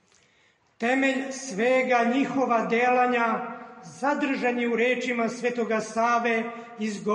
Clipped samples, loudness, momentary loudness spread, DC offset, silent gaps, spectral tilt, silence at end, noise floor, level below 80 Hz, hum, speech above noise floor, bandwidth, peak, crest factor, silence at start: under 0.1%; -25 LUFS; 10 LU; under 0.1%; none; -4.5 dB/octave; 0 s; -64 dBFS; -76 dBFS; none; 39 dB; 11 kHz; -12 dBFS; 14 dB; 0.8 s